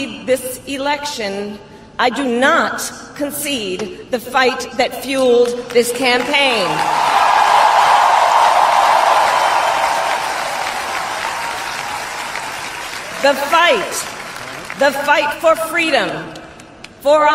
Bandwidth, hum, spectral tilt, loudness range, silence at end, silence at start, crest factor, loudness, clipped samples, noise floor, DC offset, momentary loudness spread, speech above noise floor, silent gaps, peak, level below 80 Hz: 16 kHz; none; -2 dB/octave; 7 LU; 0 s; 0 s; 14 dB; -15 LUFS; under 0.1%; -38 dBFS; under 0.1%; 13 LU; 22 dB; none; 0 dBFS; -52 dBFS